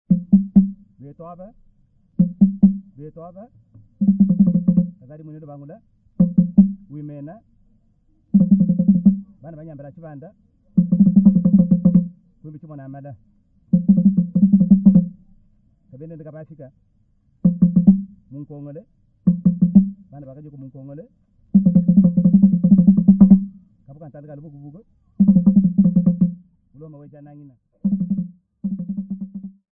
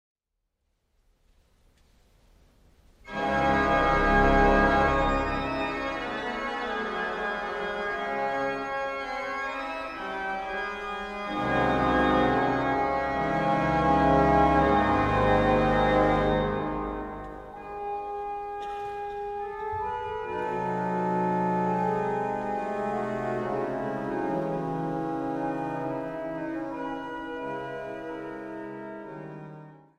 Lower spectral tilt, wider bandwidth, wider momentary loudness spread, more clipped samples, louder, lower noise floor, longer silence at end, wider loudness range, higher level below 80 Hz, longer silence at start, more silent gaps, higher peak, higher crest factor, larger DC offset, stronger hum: first, -16 dB/octave vs -7 dB/octave; second, 1.6 kHz vs 11.5 kHz; first, 25 LU vs 14 LU; neither; first, -16 LUFS vs -27 LUFS; second, -60 dBFS vs -80 dBFS; about the same, 0.3 s vs 0.2 s; second, 6 LU vs 11 LU; about the same, -46 dBFS vs -42 dBFS; second, 0.1 s vs 3.05 s; neither; first, 0 dBFS vs -8 dBFS; about the same, 18 dB vs 20 dB; neither; neither